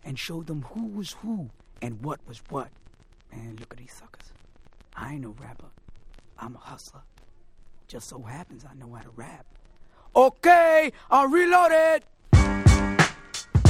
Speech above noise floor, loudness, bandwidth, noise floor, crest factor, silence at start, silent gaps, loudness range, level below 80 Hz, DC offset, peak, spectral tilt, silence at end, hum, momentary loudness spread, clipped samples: 28 dB; -21 LUFS; 16 kHz; -52 dBFS; 22 dB; 0.05 s; none; 25 LU; -36 dBFS; under 0.1%; -4 dBFS; -6 dB/octave; 0 s; none; 26 LU; under 0.1%